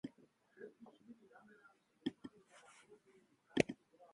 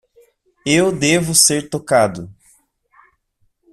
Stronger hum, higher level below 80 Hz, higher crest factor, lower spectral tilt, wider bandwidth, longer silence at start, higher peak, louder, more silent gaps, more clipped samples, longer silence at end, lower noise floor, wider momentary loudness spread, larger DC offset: neither; second, -76 dBFS vs -52 dBFS; first, 36 dB vs 18 dB; first, -5 dB/octave vs -3 dB/octave; second, 11 kHz vs 15 kHz; second, 0.05 s vs 0.65 s; second, -12 dBFS vs 0 dBFS; second, -43 LUFS vs -15 LUFS; neither; neither; second, 0.4 s vs 1.4 s; first, -72 dBFS vs -64 dBFS; first, 27 LU vs 17 LU; neither